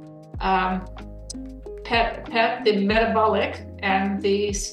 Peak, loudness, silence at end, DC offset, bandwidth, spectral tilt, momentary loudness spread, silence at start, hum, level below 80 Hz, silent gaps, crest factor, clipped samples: -6 dBFS; -22 LUFS; 0 s; under 0.1%; 12.5 kHz; -4.5 dB/octave; 17 LU; 0 s; none; -40 dBFS; none; 18 dB; under 0.1%